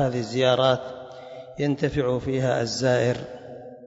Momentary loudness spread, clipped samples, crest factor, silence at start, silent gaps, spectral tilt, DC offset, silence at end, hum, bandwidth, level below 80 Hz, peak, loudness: 19 LU; under 0.1%; 18 dB; 0 s; none; -5.5 dB/octave; under 0.1%; 0 s; none; 8 kHz; -52 dBFS; -6 dBFS; -24 LUFS